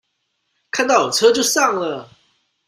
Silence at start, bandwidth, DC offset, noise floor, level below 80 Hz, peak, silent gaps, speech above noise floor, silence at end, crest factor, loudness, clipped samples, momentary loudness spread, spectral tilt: 0.75 s; 16 kHz; under 0.1%; -71 dBFS; -64 dBFS; -2 dBFS; none; 55 dB; 0.65 s; 18 dB; -16 LUFS; under 0.1%; 12 LU; -1.5 dB/octave